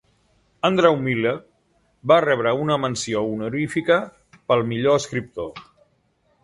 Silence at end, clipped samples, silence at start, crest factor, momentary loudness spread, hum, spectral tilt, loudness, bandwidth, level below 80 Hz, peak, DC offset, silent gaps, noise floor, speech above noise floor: 0.8 s; under 0.1%; 0.65 s; 20 dB; 15 LU; none; -5.5 dB/octave; -21 LUFS; 11.5 kHz; -58 dBFS; -2 dBFS; under 0.1%; none; -65 dBFS; 44 dB